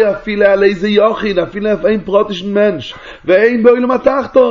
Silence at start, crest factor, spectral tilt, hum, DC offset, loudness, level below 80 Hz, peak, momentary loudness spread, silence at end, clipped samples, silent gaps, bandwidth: 0 s; 12 dB; -6.5 dB/octave; none; under 0.1%; -12 LUFS; -42 dBFS; 0 dBFS; 6 LU; 0 s; 0.1%; none; 7.2 kHz